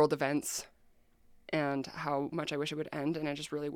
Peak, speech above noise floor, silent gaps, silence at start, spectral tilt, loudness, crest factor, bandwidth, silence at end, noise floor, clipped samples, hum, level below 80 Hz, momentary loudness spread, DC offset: -14 dBFS; 30 dB; none; 0 s; -4.5 dB/octave; -35 LUFS; 20 dB; 17.5 kHz; 0 s; -65 dBFS; under 0.1%; none; -70 dBFS; 5 LU; under 0.1%